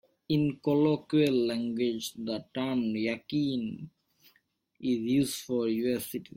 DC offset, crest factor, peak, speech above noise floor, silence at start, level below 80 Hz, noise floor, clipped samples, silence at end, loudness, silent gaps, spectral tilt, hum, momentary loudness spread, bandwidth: under 0.1%; 16 dB; -14 dBFS; 42 dB; 0.3 s; -66 dBFS; -72 dBFS; under 0.1%; 0.1 s; -30 LUFS; none; -6 dB/octave; none; 9 LU; 16.5 kHz